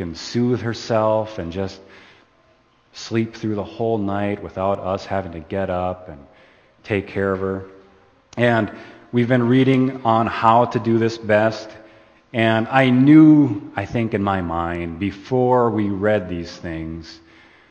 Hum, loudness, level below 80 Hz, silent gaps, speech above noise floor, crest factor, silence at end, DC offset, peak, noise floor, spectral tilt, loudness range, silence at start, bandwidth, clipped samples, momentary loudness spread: none; -19 LUFS; -50 dBFS; none; 38 dB; 20 dB; 0.55 s; under 0.1%; 0 dBFS; -57 dBFS; -7.5 dB/octave; 9 LU; 0 s; 8 kHz; under 0.1%; 14 LU